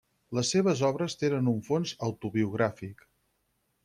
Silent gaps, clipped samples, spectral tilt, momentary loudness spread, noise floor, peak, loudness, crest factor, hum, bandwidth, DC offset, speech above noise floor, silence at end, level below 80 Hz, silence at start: none; under 0.1%; -5.5 dB/octave; 9 LU; -75 dBFS; -14 dBFS; -29 LUFS; 16 dB; none; 14 kHz; under 0.1%; 47 dB; 0.9 s; -66 dBFS; 0.3 s